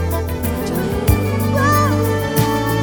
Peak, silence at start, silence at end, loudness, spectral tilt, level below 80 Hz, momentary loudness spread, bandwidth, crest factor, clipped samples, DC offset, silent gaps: -2 dBFS; 0 s; 0 s; -17 LUFS; -6 dB/octave; -28 dBFS; 6 LU; over 20 kHz; 14 dB; under 0.1%; under 0.1%; none